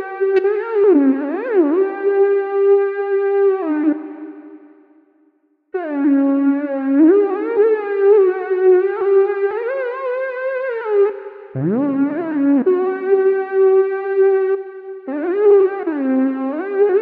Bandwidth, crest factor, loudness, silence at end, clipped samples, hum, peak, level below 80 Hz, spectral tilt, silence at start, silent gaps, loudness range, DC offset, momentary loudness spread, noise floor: 4.1 kHz; 12 dB; -16 LUFS; 0 s; under 0.1%; none; -4 dBFS; -72 dBFS; -10.5 dB/octave; 0 s; none; 5 LU; under 0.1%; 10 LU; -60 dBFS